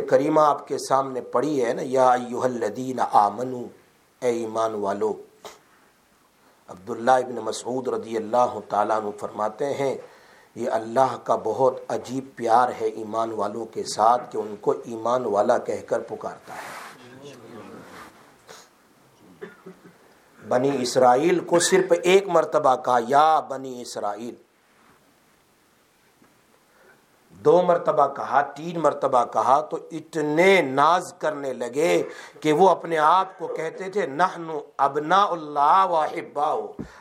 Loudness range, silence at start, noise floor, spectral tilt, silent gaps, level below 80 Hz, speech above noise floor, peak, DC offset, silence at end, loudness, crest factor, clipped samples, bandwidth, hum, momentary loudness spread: 9 LU; 0 s; -61 dBFS; -4.5 dB/octave; none; -72 dBFS; 38 dB; -4 dBFS; under 0.1%; 0.1 s; -22 LUFS; 20 dB; under 0.1%; 16 kHz; none; 16 LU